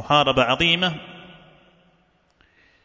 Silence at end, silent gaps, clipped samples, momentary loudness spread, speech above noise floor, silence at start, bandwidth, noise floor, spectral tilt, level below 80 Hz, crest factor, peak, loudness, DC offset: 1.55 s; none; under 0.1%; 19 LU; 43 dB; 0 s; 7.8 kHz; -62 dBFS; -4.5 dB/octave; -50 dBFS; 20 dB; -4 dBFS; -18 LUFS; under 0.1%